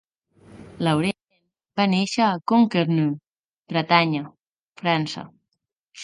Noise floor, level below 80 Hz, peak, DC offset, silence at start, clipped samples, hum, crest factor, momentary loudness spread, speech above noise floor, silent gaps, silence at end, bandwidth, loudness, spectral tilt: -79 dBFS; -64 dBFS; 0 dBFS; under 0.1%; 0.55 s; under 0.1%; none; 24 dB; 14 LU; 59 dB; 3.39-3.63 s, 4.40-4.53 s, 4.62-4.70 s; 0 s; 11.5 kHz; -22 LUFS; -6 dB/octave